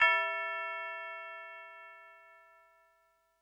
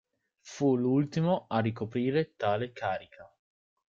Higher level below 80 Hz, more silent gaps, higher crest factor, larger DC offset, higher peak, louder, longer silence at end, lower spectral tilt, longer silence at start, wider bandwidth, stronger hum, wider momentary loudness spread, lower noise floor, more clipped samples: second, -78 dBFS vs -70 dBFS; neither; first, 24 dB vs 16 dB; neither; about the same, -14 dBFS vs -14 dBFS; second, -35 LUFS vs -30 LUFS; first, 1.05 s vs 0.65 s; second, -0.5 dB/octave vs -7.5 dB/octave; second, 0 s vs 0.45 s; first, 10.5 kHz vs 7.6 kHz; first, 50 Hz at -90 dBFS vs none; first, 23 LU vs 7 LU; first, -72 dBFS vs -55 dBFS; neither